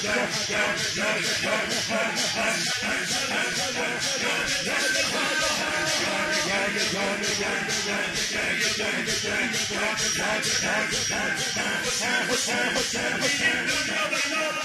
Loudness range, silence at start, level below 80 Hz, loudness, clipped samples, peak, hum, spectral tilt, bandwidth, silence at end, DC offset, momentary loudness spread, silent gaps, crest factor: 1 LU; 0 s; -56 dBFS; -24 LUFS; under 0.1%; -10 dBFS; none; -1.5 dB/octave; 13 kHz; 0 s; under 0.1%; 2 LU; none; 16 dB